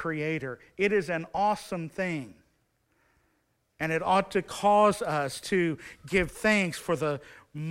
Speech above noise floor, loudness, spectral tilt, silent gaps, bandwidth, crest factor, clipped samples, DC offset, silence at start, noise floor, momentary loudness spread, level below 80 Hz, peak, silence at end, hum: 45 dB; -28 LUFS; -5 dB/octave; none; 16 kHz; 20 dB; under 0.1%; under 0.1%; 0 s; -73 dBFS; 13 LU; -56 dBFS; -10 dBFS; 0 s; none